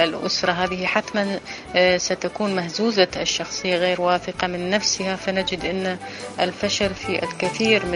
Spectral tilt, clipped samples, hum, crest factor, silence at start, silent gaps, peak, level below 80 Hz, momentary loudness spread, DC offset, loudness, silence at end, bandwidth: -3.5 dB/octave; under 0.1%; none; 20 dB; 0 s; none; -2 dBFS; -50 dBFS; 6 LU; under 0.1%; -22 LUFS; 0 s; 11 kHz